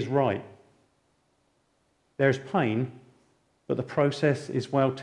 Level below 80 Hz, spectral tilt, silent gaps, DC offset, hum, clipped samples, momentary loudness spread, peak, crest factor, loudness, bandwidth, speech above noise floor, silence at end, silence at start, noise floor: -68 dBFS; -7 dB/octave; none; under 0.1%; none; under 0.1%; 9 LU; -10 dBFS; 18 dB; -27 LUFS; 11 kHz; 44 dB; 0 s; 0 s; -70 dBFS